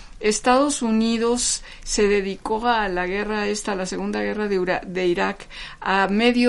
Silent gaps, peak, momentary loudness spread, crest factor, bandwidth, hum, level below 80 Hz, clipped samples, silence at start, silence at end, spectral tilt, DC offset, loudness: none; -4 dBFS; 8 LU; 16 dB; 11.5 kHz; none; -42 dBFS; under 0.1%; 0 s; 0 s; -3.5 dB/octave; under 0.1%; -22 LUFS